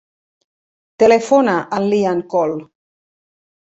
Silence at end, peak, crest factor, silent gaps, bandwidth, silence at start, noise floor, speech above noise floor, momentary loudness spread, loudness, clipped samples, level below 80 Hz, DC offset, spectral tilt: 1.15 s; -2 dBFS; 16 dB; none; 8.2 kHz; 1 s; under -90 dBFS; over 75 dB; 7 LU; -15 LUFS; under 0.1%; -60 dBFS; under 0.1%; -6 dB/octave